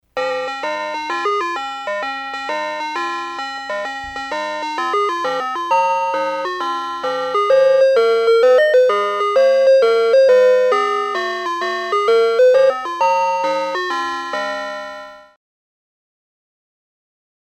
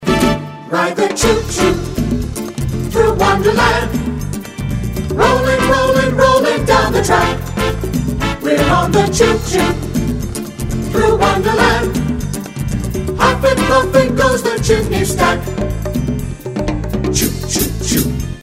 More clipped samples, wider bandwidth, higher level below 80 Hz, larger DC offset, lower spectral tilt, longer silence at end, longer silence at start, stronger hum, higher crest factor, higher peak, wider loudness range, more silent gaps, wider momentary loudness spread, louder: neither; second, 11.5 kHz vs 16.5 kHz; second, -60 dBFS vs -26 dBFS; neither; second, -2.5 dB/octave vs -5 dB/octave; first, 2.25 s vs 0 s; first, 0.15 s vs 0 s; neither; about the same, 12 dB vs 14 dB; second, -4 dBFS vs 0 dBFS; first, 10 LU vs 3 LU; neither; first, 12 LU vs 9 LU; about the same, -17 LUFS vs -15 LUFS